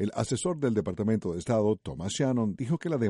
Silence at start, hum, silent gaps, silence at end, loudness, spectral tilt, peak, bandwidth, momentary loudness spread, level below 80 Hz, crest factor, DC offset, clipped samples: 0 s; none; none; 0 s; -29 LUFS; -6 dB/octave; -14 dBFS; 11.5 kHz; 4 LU; -56 dBFS; 14 dB; under 0.1%; under 0.1%